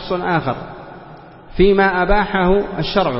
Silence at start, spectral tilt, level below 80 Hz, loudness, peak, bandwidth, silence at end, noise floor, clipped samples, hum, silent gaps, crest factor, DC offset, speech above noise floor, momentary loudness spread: 0 s; -10.5 dB/octave; -28 dBFS; -16 LUFS; 0 dBFS; 5.8 kHz; 0 s; -39 dBFS; under 0.1%; none; none; 16 dB; under 0.1%; 23 dB; 21 LU